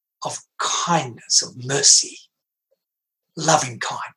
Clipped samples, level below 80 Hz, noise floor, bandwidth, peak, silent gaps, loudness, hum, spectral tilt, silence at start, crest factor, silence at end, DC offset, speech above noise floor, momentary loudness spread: under 0.1%; -74 dBFS; -83 dBFS; 13 kHz; 0 dBFS; none; -18 LUFS; none; -1.5 dB/octave; 0.2 s; 22 dB; 0.1 s; under 0.1%; 63 dB; 17 LU